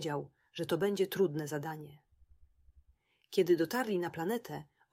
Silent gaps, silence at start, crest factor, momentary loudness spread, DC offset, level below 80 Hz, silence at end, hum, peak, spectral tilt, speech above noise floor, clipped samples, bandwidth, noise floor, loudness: none; 0 s; 18 dB; 17 LU; under 0.1%; -70 dBFS; 0.3 s; none; -18 dBFS; -5.5 dB/octave; 38 dB; under 0.1%; 16 kHz; -71 dBFS; -34 LUFS